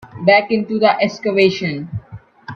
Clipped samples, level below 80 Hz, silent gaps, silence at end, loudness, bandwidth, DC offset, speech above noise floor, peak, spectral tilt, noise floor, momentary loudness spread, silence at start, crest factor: under 0.1%; -54 dBFS; none; 0 s; -15 LUFS; 7 kHz; under 0.1%; 23 dB; 0 dBFS; -6 dB/octave; -38 dBFS; 16 LU; 0 s; 16 dB